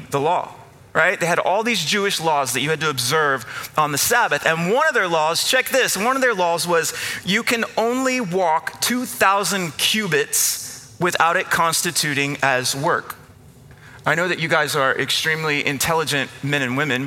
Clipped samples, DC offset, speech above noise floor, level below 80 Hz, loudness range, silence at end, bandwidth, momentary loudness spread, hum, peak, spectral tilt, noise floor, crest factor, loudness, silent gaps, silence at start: under 0.1%; under 0.1%; 25 dB; -58 dBFS; 2 LU; 0 s; 17 kHz; 6 LU; none; 0 dBFS; -2.5 dB/octave; -45 dBFS; 20 dB; -19 LUFS; none; 0 s